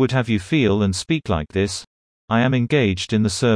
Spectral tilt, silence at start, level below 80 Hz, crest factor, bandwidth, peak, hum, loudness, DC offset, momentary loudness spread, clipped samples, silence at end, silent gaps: -5.5 dB/octave; 0 s; -44 dBFS; 14 dB; 10.5 kHz; -4 dBFS; none; -20 LUFS; under 0.1%; 5 LU; under 0.1%; 0 s; 1.87-2.28 s